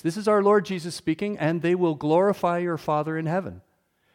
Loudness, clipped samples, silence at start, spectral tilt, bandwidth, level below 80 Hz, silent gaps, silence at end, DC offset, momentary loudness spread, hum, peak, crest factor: -24 LUFS; under 0.1%; 0.05 s; -6.5 dB/octave; 16 kHz; -64 dBFS; none; 0.55 s; under 0.1%; 8 LU; none; -8 dBFS; 16 dB